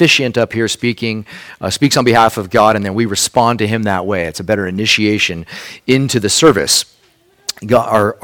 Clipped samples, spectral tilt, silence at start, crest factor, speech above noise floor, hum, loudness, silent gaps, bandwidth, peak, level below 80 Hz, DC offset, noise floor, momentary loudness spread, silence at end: 0.2%; -3.5 dB/octave; 0 s; 14 dB; 39 dB; none; -13 LUFS; none; 19.5 kHz; 0 dBFS; -46 dBFS; under 0.1%; -52 dBFS; 15 LU; 0.1 s